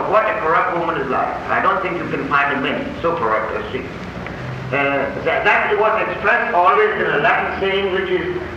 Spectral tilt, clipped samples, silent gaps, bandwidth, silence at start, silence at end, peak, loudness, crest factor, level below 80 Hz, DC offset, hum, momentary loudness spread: -6 dB/octave; under 0.1%; none; 8.6 kHz; 0 s; 0 s; -2 dBFS; -17 LUFS; 16 dB; -44 dBFS; under 0.1%; none; 10 LU